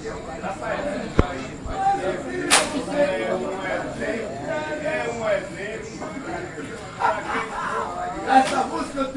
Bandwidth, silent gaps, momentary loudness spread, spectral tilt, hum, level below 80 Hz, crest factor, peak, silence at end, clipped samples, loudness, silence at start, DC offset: 11.5 kHz; none; 13 LU; -3.5 dB/octave; none; -40 dBFS; 24 dB; 0 dBFS; 0 s; under 0.1%; -24 LUFS; 0 s; under 0.1%